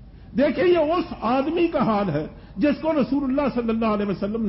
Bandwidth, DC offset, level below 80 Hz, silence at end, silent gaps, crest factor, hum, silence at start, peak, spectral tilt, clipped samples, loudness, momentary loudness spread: 5.8 kHz; under 0.1%; -46 dBFS; 0 s; none; 12 dB; none; 0 s; -10 dBFS; -11.5 dB/octave; under 0.1%; -22 LUFS; 6 LU